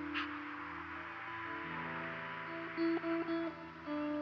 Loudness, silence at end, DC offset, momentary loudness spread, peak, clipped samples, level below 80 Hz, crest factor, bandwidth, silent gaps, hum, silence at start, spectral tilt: -41 LUFS; 0 s; under 0.1%; 8 LU; -26 dBFS; under 0.1%; -74 dBFS; 16 dB; 6.4 kHz; none; none; 0 s; -3.5 dB/octave